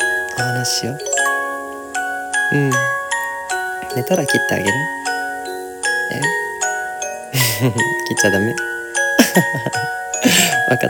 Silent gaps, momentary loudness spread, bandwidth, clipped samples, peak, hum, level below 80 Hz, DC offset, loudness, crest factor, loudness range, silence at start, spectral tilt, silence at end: none; 9 LU; 18 kHz; under 0.1%; 0 dBFS; none; -56 dBFS; under 0.1%; -18 LUFS; 18 dB; 3 LU; 0 s; -3 dB/octave; 0 s